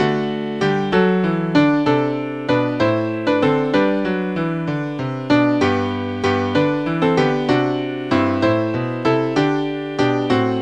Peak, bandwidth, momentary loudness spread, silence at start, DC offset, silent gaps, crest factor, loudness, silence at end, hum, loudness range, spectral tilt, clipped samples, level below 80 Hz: -2 dBFS; 8.8 kHz; 6 LU; 0 s; 0.3%; none; 16 dB; -18 LUFS; 0 s; none; 1 LU; -7 dB/octave; under 0.1%; -54 dBFS